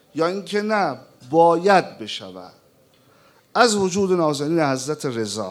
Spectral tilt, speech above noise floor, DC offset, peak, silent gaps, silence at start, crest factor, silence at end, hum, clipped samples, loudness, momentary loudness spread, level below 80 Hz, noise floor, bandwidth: -4.5 dB/octave; 36 dB; under 0.1%; 0 dBFS; none; 0.15 s; 20 dB; 0 s; none; under 0.1%; -20 LUFS; 14 LU; -68 dBFS; -56 dBFS; 15 kHz